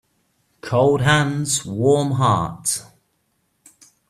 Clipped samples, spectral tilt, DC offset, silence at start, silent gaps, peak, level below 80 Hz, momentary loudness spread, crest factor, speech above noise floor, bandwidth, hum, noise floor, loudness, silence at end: under 0.1%; -4.5 dB/octave; under 0.1%; 0.65 s; none; -2 dBFS; -54 dBFS; 7 LU; 18 dB; 50 dB; 15 kHz; none; -68 dBFS; -19 LUFS; 1.25 s